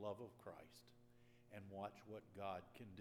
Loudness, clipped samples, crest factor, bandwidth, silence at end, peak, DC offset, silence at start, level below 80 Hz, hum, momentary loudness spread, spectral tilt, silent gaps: -55 LUFS; under 0.1%; 20 dB; 17 kHz; 0 s; -34 dBFS; under 0.1%; 0 s; -84 dBFS; none; 11 LU; -6 dB/octave; none